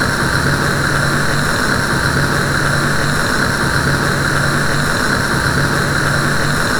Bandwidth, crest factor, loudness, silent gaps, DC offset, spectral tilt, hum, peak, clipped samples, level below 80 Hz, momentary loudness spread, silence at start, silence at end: 19.5 kHz; 14 dB; -15 LUFS; none; under 0.1%; -4 dB/octave; none; 0 dBFS; under 0.1%; -28 dBFS; 1 LU; 0 s; 0 s